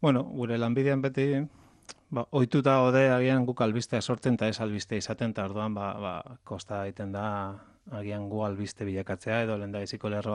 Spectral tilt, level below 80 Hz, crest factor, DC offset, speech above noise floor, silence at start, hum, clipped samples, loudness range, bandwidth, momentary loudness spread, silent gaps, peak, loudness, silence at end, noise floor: -6.5 dB/octave; -66 dBFS; 18 dB; under 0.1%; 24 dB; 0 s; none; under 0.1%; 9 LU; 11 kHz; 14 LU; none; -12 dBFS; -29 LUFS; 0 s; -52 dBFS